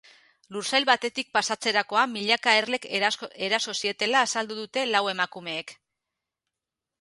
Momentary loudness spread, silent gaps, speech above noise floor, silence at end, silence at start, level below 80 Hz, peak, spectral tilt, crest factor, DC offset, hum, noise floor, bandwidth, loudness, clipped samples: 10 LU; none; 62 dB; 1.3 s; 0.5 s; -78 dBFS; -4 dBFS; -1.5 dB/octave; 22 dB; under 0.1%; none; -88 dBFS; 11.5 kHz; -25 LUFS; under 0.1%